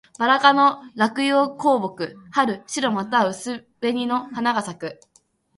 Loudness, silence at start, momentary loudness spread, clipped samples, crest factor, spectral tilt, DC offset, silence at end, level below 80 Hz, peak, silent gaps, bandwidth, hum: -21 LUFS; 0.2 s; 15 LU; under 0.1%; 20 dB; -4 dB/octave; under 0.1%; 0.65 s; -68 dBFS; -2 dBFS; none; 11.5 kHz; none